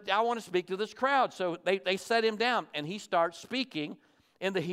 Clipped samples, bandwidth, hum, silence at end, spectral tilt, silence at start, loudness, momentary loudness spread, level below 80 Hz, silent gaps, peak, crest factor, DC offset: under 0.1%; 15.5 kHz; none; 0 s; -4 dB/octave; 0 s; -31 LUFS; 9 LU; -82 dBFS; none; -12 dBFS; 18 dB; under 0.1%